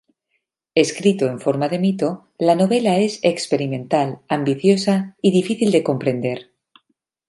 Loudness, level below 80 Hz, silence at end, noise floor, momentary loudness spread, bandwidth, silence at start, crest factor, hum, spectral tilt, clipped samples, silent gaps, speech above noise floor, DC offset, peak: -19 LUFS; -66 dBFS; 0.85 s; -73 dBFS; 6 LU; 11.5 kHz; 0.75 s; 18 dB; none; -6 dB/octave; under 0.1%; none; 55 dB; under 0.1%; -2 dBFS